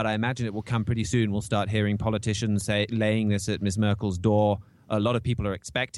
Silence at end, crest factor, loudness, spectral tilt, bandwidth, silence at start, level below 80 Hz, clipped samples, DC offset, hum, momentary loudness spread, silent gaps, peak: 0 s; 14 dB; -26 LUFS; -6 dB/octave; 12 kHz; 0 s; -48 dBFS; under 0.1%; under 0.1%; none; 5 LU; none; -10 dBFS